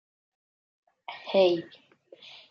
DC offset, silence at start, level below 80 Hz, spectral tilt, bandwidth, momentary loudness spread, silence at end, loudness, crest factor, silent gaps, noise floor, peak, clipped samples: under 0.1%; 1.1 s; -84 dBFS; -6.5 dB/octave; 6.4 kHz; 25 LU; 0.85 s; -25 LUFS; 20 dB; none; -53 dBFS; -10 dBFS; under 0.1%